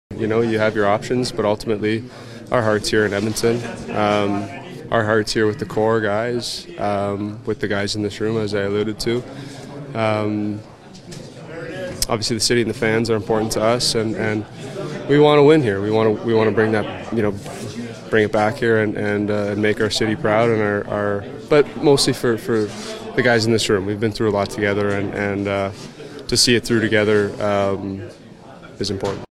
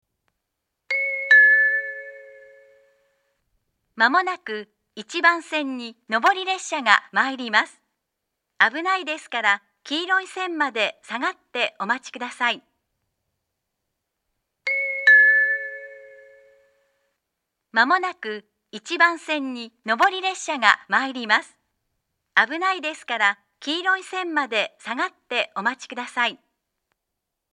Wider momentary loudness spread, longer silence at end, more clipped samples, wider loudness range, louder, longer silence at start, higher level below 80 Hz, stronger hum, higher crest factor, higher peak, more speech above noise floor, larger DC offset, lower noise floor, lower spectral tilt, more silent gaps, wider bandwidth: about the same, 14 LU vs 15 LU; second, 0.1 s vs 1.15 s; neither; about the same, 6 LU vs 7 LU; about the same, -19 LUFS vs -21 LUFS; second, 0.1 s vs 0.9 s; first, -44 dBFS vs -84 dBFS; neither; second, 18 dB vs 24 dB; about the same, 0 dBFS vs 0 dBFS; second, 21 dB vs 58 dB; neither; second, -40 dBFS vs -82 dBFS; first, -5 dB/octave vs -1.5 dB/octave; neither; first, 15.5 kHz vs 11 kHz